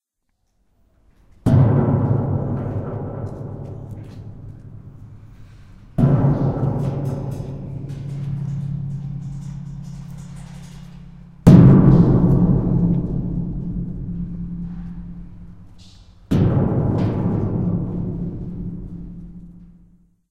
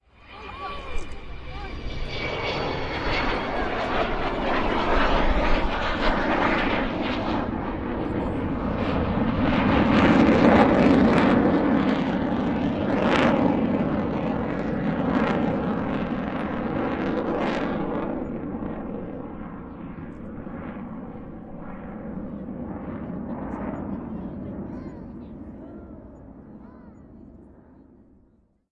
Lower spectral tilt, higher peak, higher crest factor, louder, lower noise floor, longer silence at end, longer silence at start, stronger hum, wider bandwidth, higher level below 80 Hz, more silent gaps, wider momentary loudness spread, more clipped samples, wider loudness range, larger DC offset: first, -10 dB/octave vs -7.5 dB/octave; about the same, 0 dBFS vs -2 dBFS; about the same, 20 dB vs 24 dB; first, -19 LUFS vs -24 LUFS; first, -71 dBFS vs -61 dBFS; second, 0.65 s vs 1.2 s; first, 1.45 s vs 0.25 s; neither; about the same, 8.6 kHz vs 8.6 kHz; about the same, -34 dBFS vs -36 dBFS; neither; about the same, 22 LU vs 20 LU; neither; about the same, 15 LU vs 17 LU; neither